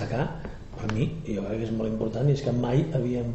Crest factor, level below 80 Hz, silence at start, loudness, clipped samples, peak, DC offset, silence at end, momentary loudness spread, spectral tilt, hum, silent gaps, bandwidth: 16 dB; -42 dBFS; 0 s; -28 LUFS; under 0.1%; -12 dBFS; under 0.1%; 0 s; 8 LU; -8 dB/octave; none; none; 8.2 kHz